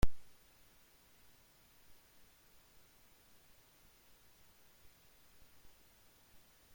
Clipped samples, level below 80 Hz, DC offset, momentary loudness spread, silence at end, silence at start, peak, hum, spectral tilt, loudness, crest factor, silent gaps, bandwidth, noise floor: under 0.1%; -52 dBFS; under 0.1%; 0 LU; 6.55 s; 0.05 s; -16 dBFS; none; -5.5 dB/octave; -60 LUFS; 24 dB; none; 16.5 kHz; -66 dBFS